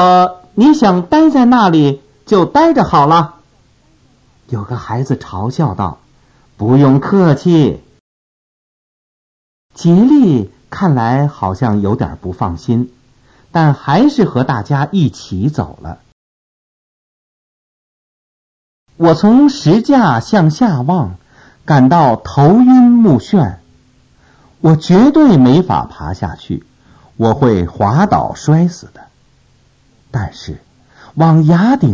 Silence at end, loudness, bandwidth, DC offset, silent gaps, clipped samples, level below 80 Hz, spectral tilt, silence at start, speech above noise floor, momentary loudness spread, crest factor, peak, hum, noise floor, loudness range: 0 s; -11 LUFS; 7.6 kHz; under 0.1%; 8.00-9.69 s, 16.12-18.86 s; under 0.1%; -38 dBFS; -8 dB/octave; 0 s; 40 dB; 14 LU; 12 dB; 0 dBFS; none; -51 dBFS; 8 LU